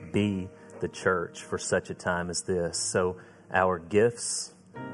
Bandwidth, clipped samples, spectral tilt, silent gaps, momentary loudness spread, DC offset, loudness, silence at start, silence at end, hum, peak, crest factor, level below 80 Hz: 12 kHz; under 0.1%; -4 dB/octave; none; 12 LU; under 0.1%; -29 LUFS; 0 s; 0 s; none; -8 dBFS; 20 dB; -54 dBFS